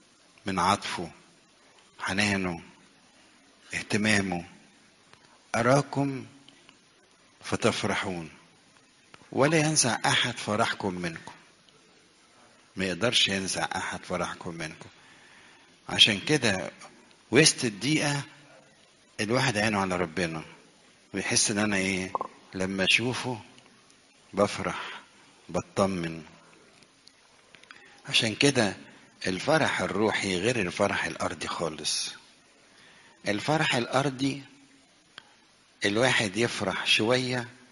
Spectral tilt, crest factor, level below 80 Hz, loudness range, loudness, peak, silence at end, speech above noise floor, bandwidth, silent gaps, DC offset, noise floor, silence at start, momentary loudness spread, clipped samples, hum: -3.5 dB/octave; 26 dB; -62 dBFS; 6 LU; -27 LUFS; -4 dBFS; 0.15 s; 33 dB; 11.5 kHz; none; under 0.1%; -60 dBFS; 0.45 s; 16 LU; under 0.1%; none